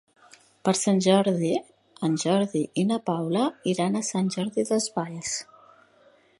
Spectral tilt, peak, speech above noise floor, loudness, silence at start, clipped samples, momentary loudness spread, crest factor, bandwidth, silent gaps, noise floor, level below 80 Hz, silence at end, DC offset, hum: -5 dB/octave; -6 dBFS; 34 dB; -25 LUFS; 0.65 s; under 0.1%; 9 LU; 20 dB; 11.5 kHz; none; -59 dBFS; -70 dBFS; 0.95 s; under 0.1%; none